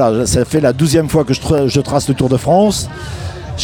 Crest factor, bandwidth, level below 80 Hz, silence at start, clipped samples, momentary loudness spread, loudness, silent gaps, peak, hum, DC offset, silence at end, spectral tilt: 14 dB; 18 kHz; -34 dBFS; 0 s; under 0.1%; 13 LU; -13 LUFS; none; 0 dBFS; none; under 0.1%; 0 s; -5.5 dB/octave